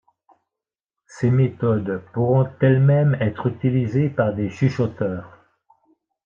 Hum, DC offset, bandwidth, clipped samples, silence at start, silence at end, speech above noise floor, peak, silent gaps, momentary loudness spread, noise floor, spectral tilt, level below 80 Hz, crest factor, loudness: none; under 0.1%; 7.2 kHz; under 0.1%; 1.15 s; 1 s; 69 dB; -4 dBFS; none; 8 LU; -88 dBFS; -9.5 dB/octave; -60 dBFS; 16 dB; -20 LUFS